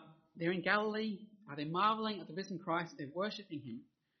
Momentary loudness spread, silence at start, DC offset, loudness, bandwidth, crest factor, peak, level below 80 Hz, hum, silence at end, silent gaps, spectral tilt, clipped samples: 14 LU; 0 s; under 0.1%; -37 LUFS; 6.2 kHz; 22 dB; -16 dBFS; -82 dBFS; none; 0.35 s; none; -3.5 dB/octave; under 0.1%